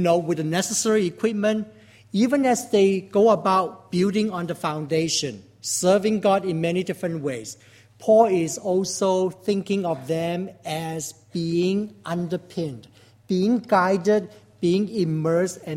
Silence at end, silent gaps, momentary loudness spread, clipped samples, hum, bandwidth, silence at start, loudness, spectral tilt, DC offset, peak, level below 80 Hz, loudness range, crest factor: 0 s; none; 11 LU; under 0.1%; none; 16.5 kHz; 0 s; -23 LUFS; -5 dB/octave; under 0.1%; -4 dBFS; -64 dBFS; 5 LU; 18 dB